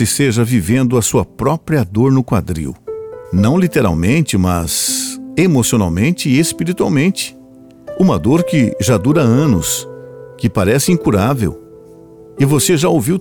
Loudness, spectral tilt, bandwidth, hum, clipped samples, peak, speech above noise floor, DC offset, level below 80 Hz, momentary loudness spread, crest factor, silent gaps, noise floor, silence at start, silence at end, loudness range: -14 LUFS; -5.5 dB/octave; 19 kHz; none; under 0.1%; -2 dBFS; 27 dB; under 0.1%; -38 dBFS; 9 LU; 12 dB; none; -40 dBFS; 0 s; 0 s; 2 LU